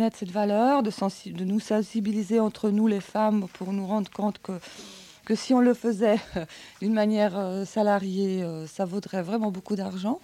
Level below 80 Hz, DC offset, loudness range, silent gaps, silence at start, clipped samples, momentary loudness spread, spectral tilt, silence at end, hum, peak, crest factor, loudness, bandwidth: -64 dBFS; under 0.1%; 2 LU; none; 0 s; under 0.1%; 11 LU; -6.5 dB/octave; 0.05 s; none; -10 dBFS; 16 dB; -26 LUFS; 13 kHz